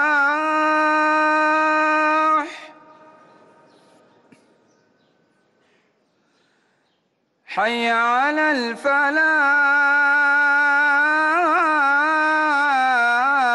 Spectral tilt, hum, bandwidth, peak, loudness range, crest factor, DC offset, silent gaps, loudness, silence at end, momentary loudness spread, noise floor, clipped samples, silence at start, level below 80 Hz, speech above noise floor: -2.5 dB/octave; none; 11.5 kHz; -10 dBFS; 10 LU; 10 dB; under 0.1%; none; -17 LUFS; 0 s; 5 LU; -68 dBFS; under 0.1%; 0 s; -74 dBFS; 50 dB